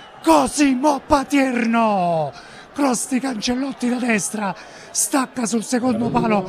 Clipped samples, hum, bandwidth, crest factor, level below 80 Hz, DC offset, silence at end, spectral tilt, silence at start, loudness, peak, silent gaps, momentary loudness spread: under 0.1%; none; 14.5 kHz; 20 dB; -48 dBFS; under 0.1%; 0 s; -4 dB/octave; 0 s; -19 LUFS; 0 dBFS; none; 8 LU